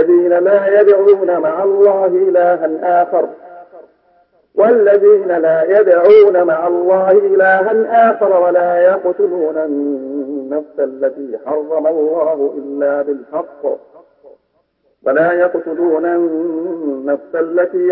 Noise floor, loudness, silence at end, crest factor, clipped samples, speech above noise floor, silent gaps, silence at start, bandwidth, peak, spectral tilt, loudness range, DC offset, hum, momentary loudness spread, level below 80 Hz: -62 dBFS; -13 LUFS; 0 s; 12 dB; under 0.1%; 49 dB; none; 0 s; 4.8 kHz; 0 dBFS; -11 dB/octave; 8 LU; under 0.1%; none; 12 LU; -68 dBFS